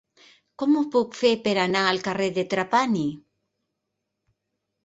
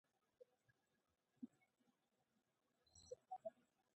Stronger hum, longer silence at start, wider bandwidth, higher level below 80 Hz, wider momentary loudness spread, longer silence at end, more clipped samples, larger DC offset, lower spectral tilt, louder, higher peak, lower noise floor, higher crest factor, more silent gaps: neither; first, 0.6 s vs 0.4 s; about the same, 8.2 kHz vs 8.2 kHz; first, -66 dBFS vs under -90 dBFS; about the same, 5 LU vs 6 LU; first, 1.65 s vs 0.3 s; neither; neither; about the same, -5 dB/octave vs -4.5 dB/octave; first, -23 LUFS vs -60 LUFS; first, -6 dBFS vs -40 dBFS; second, -81 dBFS vs -88 dBFS; about the same, 20 dB vs 24 dB; neither